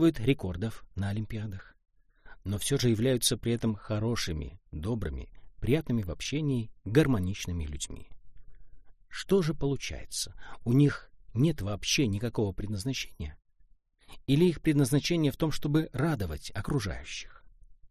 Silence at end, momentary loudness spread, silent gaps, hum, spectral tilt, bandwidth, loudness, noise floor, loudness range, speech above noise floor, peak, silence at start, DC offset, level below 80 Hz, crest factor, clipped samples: 0 s; 14 LU; none; none; -5.5 dB/octave; 14.5 kHz; -30 LUFS; -61 dBFS; 3 LU; 32 dB; -10 dBFS; 0 s; under 0.1%; -46 dBFS; 20 dB; under 0.1%